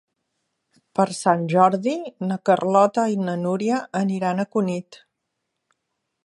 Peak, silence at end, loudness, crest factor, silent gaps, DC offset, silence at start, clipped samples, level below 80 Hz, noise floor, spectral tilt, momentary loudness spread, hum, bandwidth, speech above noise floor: -2 dBFS; 1.3 s; -22 LUFS; 20 dB; none; under 0.1%; 1 s; under 0.1%; -72 dBFS; -78 dBFS; -6.5 dB/octave; 9 LU; none; 11.5 kHz; 58 dB